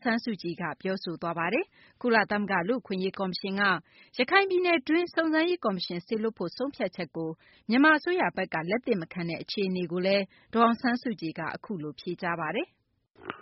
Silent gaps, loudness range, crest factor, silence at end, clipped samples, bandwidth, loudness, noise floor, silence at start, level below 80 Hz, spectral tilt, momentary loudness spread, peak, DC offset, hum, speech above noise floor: none; 3 LU; 20 dB; 0 s; under 0.1%; 5.8 kHz; -28 LUFS; -56 dBFS; 0 s; -70 dBFS; -3.5 dB/octave; 12 LU; -8 dBFS; under 0.1%; none; 27 dB